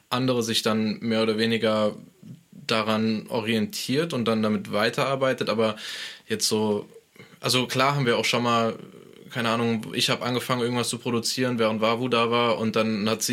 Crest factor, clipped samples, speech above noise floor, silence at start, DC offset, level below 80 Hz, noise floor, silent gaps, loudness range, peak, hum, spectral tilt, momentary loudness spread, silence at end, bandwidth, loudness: 20 dB; under 0.1%; 21 dB; 0.1 s; under 0.1%; -70 dBFS; -46 dBFS; none; 2 LU; -4 dBFS; none; -4 dB/octave; 6 LU; 0 s; 16.5 kHz; -24 LUFS